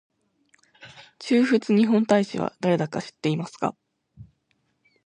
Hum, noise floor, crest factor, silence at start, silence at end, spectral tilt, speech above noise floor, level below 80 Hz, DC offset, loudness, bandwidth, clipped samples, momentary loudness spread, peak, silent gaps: none; -71 dBFS; 20 dB; 0.85 s; 0.85 s; -6.5 dB/octave; 49 dB; -68 dBFS; under 0.1%; -23 LUFS; 10 kHz; under 0.1%; 10 LU; -6 dBFS; none